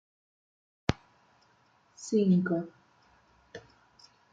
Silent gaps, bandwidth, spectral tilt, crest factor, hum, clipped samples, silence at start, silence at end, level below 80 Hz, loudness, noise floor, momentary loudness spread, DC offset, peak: none; 7.8 kHz; -7 dB/octave; 28 dB; none; under 0.1%; 0.9 s; 0.75 s; -58 dBFS; -29 LUFS; -66 dBFS; 25 LU; under 0.1%; -6 dBFS